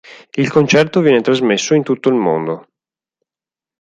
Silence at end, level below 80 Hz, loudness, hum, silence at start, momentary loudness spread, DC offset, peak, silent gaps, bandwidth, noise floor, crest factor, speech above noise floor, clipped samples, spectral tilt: 1.2 s; -58 dBFS; -14 LUFS; none; 0.1 s; 10 LU; under 0.1%; 0 dBFS; none; 9.6 kHz; -90 dBFS; 14 dB; 77 dB; under 0.1%; -5 dB/octave